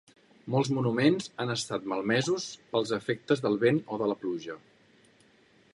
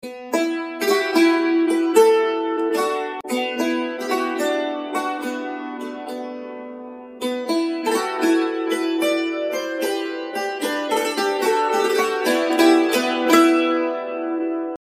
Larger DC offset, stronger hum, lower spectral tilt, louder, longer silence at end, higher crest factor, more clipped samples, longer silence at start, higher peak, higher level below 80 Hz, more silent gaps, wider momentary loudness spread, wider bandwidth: neither; neither; first, -5.5 dB/octave vs -2.5 dB/octave; second, -29 LUFS vs -20 LUFS; first, 1.15 s vs 0.05 s; about the same, 20 dB vs 18 dB; neither; first, 0.45 s vs 0.05 s; second, -10 dBFS vs -2 dBFS; about the same, -72 dBFS vs -68 dBFS; neither; second, 9 LU vs 14 LU; second, 11.5 kHz vs 16 kHz